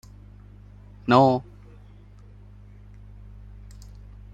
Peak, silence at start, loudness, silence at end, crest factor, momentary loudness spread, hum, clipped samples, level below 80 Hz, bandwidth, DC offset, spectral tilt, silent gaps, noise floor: -2 dBFS; 1.05 s; -21 LUFS; 2.95 s; 26 dB; 29 LU; 50 Hz at -45 dBFS; under 0.1%; -48 dBFS; 9.2 kHz; under 0.1%; -7.5 dB/octave; none; -47 dBFS